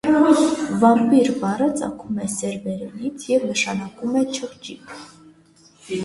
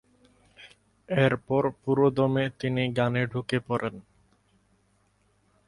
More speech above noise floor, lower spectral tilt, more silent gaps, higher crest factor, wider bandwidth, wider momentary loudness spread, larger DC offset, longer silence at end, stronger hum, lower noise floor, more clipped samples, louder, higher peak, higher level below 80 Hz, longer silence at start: second, 33 dB vs 42 dB; second, -5 dB/octave vs -7.5 dB/octave; neither; about the same, 18 dB vs 22 dB; about the same, 11.5 kHz vs 11 kHz; first, 18 LU vs 7 LU; neither; second, 0 s vs 1.65 s; neither; second, -53 dBFS vs -67 dBFS; neither; first, -20 LUFS vs -26 LUFS; first, -2 dBFS vs -8 dBFS; about the same, -58 dBFS vs -60 dBFS; second, 0.05 s vs 0.6 s